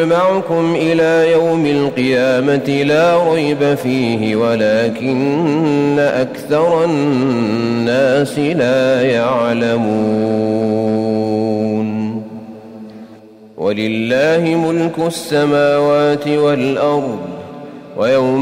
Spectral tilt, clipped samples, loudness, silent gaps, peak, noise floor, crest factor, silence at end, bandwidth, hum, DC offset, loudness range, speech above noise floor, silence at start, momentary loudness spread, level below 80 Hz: -6.5 dB/octave; under 0.1%; -14 LUFS; none; -4 dBFS; -39 dBFS; 10 dB; 0 s; 16 kHz; none; under 0.1%; 5 LU; 26 dB; 0 s; 8 LU; -54 dBFS